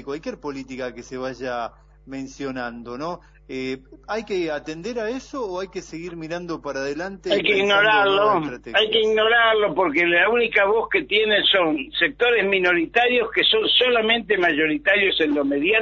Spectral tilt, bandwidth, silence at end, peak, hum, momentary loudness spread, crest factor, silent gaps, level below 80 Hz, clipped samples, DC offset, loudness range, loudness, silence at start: -4 dB/octave; 7.6 kHz; 0 s; -4 dBFS; none; 15 LU; 18 dB; none; -52 dBFS; under 0.1%; under 0.1%; 13 LU; -19 LUFS; 0 s